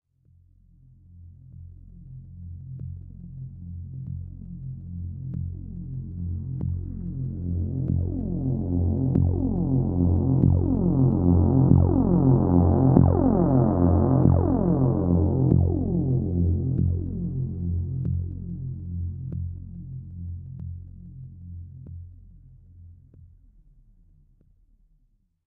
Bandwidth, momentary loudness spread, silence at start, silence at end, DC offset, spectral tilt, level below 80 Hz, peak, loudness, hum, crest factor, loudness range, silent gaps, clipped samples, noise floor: 1.8 kHz; 21 LU; 1.15 s; 2.2 s; under 0.1%; -15.5 dB/octave; -38 dBFS; -2 dBFS; -23 LUFS; none; 22 dB; 21 LU; none; under 0.1%; -66 dBFS